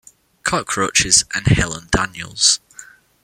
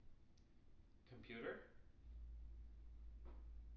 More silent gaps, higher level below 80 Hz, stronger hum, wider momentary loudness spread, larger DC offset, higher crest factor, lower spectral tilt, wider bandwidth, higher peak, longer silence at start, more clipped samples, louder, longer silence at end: neither; first, -36 dBFS vs -60 dBFS; neither; second, 9 LU vs 13 LU; neither; about the same, 20 dB vs 18 dB; second, -2 dB/octave vs -5 dB/octave; first, 16.5 kHz vs 6 kHz; first, 0 dBFS vs -38 dBFS; first, 0.45 s vs 0 s; neither; first, -16 LUFS vs -58 LUFS; first, 0.4 s vs 0 s